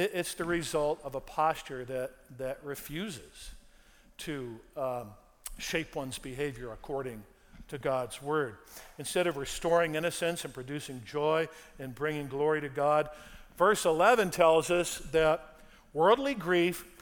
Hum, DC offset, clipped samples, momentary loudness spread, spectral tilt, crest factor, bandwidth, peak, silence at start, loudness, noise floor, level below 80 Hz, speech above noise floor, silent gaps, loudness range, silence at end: none; under 0.1%; under 0.1%; 18 LU; -4 dB/octave; 22 dB; over 20 kHz; -10 dBFS; 0 s; -31 LUFS; -59 dBFS; -56 dBFS; 28 dB; none; 12 LU; 0.1 s